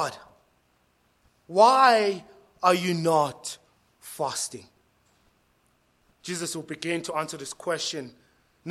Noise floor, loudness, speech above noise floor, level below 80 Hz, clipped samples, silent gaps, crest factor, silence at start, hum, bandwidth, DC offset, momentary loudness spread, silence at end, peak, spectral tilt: -67 dBFS; -25 LUFS; 43 dB; -72 dBFS; under 0.1%; none; 22 dB; 0 s; none; 15.5 kHz; under 0.1%; 22 LU; 0 s; -6 dBFS; -3.5 dB/octave